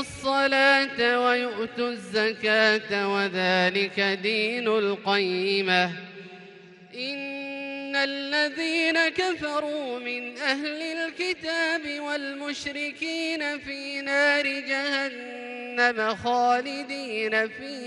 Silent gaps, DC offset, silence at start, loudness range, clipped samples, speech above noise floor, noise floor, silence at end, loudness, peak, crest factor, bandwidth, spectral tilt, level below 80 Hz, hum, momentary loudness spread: none; under 0.1%; 0 s; 5 LU; under 0.1%; 22 dB; -48 dBFS; 0 s; -25 LUFS; -8 dBFS; 18 dB; 11.5 kHz; -3.5 dB/octave; -66 dBFS; none; 11 LU